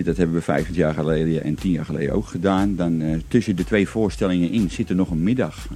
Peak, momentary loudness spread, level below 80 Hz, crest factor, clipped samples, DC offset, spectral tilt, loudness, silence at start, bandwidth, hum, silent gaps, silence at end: -4 dBFS; 3 LU; -36 dBFS; 16 dB; under 0.1%; under 0.1%; -7.5 dB/octave; -21 LUFS; 0 s; 13.5 kHz; none; none; 0 s